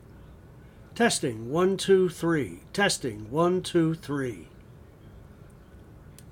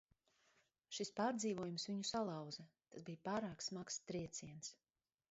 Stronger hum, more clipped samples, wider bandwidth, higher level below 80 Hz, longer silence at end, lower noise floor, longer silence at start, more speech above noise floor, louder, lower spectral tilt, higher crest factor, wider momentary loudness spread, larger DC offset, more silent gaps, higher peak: neither; neither; first, 17 kHz vs 8 kHz; first, -54 dBFS vs -78 dBFS; second, 0 s vs 0.55 s; second, -50 dBFS vs -79 dBFS; second, 0.15 s vs 0.9 s; second, 24 dB vs 34 dB; first, -26 LUFS vs -46 LUFS; about the same, -4.5 dB/octave vs -4 dB/octave; about the same, 18 dB vs 20 dB; about the same, 10 LU vs 12 LU; neither; neither; first, -10 dBFS vs -28 dBFS